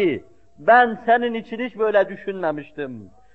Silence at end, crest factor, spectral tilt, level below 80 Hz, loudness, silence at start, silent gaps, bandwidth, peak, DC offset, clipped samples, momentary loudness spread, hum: 0.3 s; 18 dB; -7.5 dB/octave; -62 dBFS; -20 LUFS; 0 s; none; 4.6 kHz; -4 dBFS; 0.3%; under 0.1%; 17 LU; none